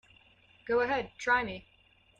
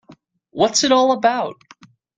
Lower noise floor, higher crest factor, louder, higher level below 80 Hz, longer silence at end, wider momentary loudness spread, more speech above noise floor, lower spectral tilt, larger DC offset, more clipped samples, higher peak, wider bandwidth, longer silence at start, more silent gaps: first, -62 dBFS vs -50 dBFS; about the same, 18 dB vs 18 dB; second, -31 LUFS vs -17 LUFS; about the same, -62 dBFS vs -64 dBFS; about the same, 0.6 s vs 0.65 s; about the same, 16 LU vs 14 LU; about the same, 32 dB vs 33 dB; first, -4 dB/octave vs -2.5 dB/octave; neither; neither; second, -16 dBFS vs -2 dBFS; about the same, 8.8 kHz vs 9.6 kHz; first, 0.65 s vs 0.1 s; neither